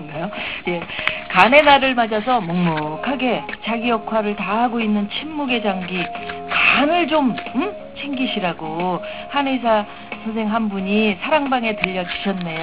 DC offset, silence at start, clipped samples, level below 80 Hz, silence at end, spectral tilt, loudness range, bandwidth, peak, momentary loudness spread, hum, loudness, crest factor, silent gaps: 0.6%; 0 s; under 0.1%; -50 dBFS; 0 s; -9 dB/octave; 5 LU; 4 kHz; 0 dBFS; 11 LU; none; -19 LUFS; 20 dB; none